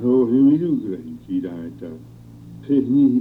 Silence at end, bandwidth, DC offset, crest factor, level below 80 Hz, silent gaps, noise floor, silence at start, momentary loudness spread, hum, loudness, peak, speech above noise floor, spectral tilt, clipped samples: 0 s; 3.9 kHz; under 0.1%; 12 dB; -56 dBFS; none; -40 dBFS; 0 s; 21 LU; none; -19 LUFS; -8 dBFS; 21 dB; -10.5 dB/octave; under 0.1%